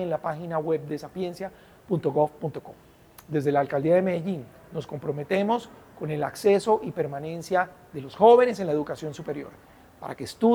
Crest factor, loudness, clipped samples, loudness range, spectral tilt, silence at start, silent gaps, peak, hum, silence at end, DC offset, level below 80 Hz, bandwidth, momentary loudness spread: 20 dB; -26 LUFS; under 0.1%; 6 LU; -7 dB/octave; 0 s; none; -6 dBFS; none; 0 s; under 0.1%; -64 dBFS; over 20 kHz; 16 LU